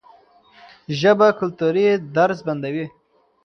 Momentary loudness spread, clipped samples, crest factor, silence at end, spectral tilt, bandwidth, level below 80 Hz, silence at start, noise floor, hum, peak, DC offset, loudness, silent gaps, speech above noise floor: 14 LU; under 0.1%; 18 dB; 0.55 s; -6.5 dB/octave; 6.6 kHz; -64 dBFS; 0.9 s; -51 dBFS; none; -2 dBFS; under 0.1%; -19 LUFS; none; 33 dB